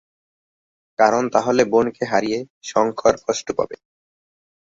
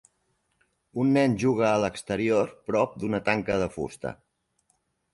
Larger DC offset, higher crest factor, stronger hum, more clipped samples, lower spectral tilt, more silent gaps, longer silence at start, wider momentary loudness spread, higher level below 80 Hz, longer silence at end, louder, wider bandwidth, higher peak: neither; about the same, 20 dB vs 18 dB; neither; neither; second, -4.5 dB/octave vs -6.5 dB/octave; first, 2.50-2.61 s vs none; about the same, 1 s vs 0.95 s; about the same, 9 LU vs 11 LU; about the same, -56 dBFS vs -56 dBFS; about the same, 1 s vs 1 s; first, -20 LUFS vs -26 LUFS; second, 8 kHz vs 11.5 kHz; first, -2 dBFS vs -8 dBFS